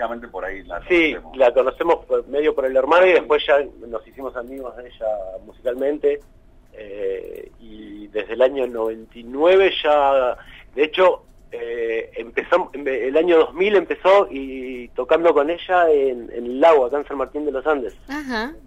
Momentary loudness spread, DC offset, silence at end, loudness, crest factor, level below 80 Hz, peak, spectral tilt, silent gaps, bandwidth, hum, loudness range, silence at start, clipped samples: 16 LU; under 0.1%; 0.05 s; -19 LUFS; 16 dB; -48 dBFS; -4 dBFS; -5 dB/octave; none; 8.8 kHz; none; 9 LU; 0 s; under 0.1%